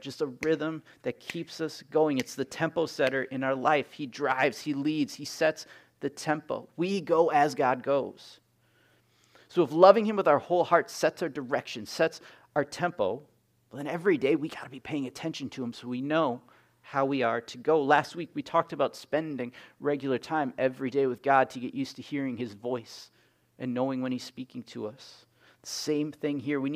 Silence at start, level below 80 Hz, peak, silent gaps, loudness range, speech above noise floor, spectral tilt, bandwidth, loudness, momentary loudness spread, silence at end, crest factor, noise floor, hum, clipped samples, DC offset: 0 s; -76 dBFS; -4 dBFS; none; 7 LU; 38 dB; -5 dB/octave; 15.5 kHz; -29 LUFS; 13 LU; 0 s; 26 dB; -66 dBFS; none; under 0.1%; under 0.1%